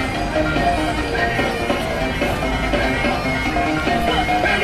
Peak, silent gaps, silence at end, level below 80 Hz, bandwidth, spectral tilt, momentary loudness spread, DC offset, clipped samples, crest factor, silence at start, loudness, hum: -4 dBFS; none; 0 s; -30 dBFS; 15.5 kHz; -5 dB/octave; 3 LU; under 0.1%; under 0.1%; 14 dB; 0 s; -19 LUFS; none